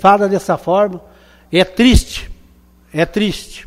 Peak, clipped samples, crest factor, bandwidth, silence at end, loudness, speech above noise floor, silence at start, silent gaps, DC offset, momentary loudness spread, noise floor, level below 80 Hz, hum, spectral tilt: 0 dBFS; under 0.1%; 16 dB; 15.5 kHz; 0.05 s; -15 LUFS; 34 dB; 0 s; none; under 0.1%; 15 LU; -47 dBFS; -26 dBFS; none; -5.5 dB/octave